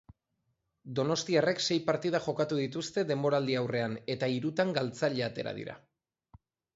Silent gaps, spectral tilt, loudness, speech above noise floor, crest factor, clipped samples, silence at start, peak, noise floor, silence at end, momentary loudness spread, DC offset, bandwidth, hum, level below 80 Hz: none; -5 dB/octave; -31 LUFS; 49 dB; 20 dB; under 0.1%; 0.85 s; -14 dBFS; -80 dBFS; 1 s; 7 LU; under 0.1%; 8 kHz; none; -70 dBFS